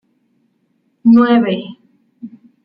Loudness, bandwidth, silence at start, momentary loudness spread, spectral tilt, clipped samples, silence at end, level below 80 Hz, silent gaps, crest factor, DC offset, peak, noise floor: -13 LUFS; 5 kHz; 1.05 s; 26 LU; -9.5 dB/octave; under 0.1%; 0.4 s; -62 dBFS; none; 14 dB; under 0.1%; -2 dBFS; -63 dBFS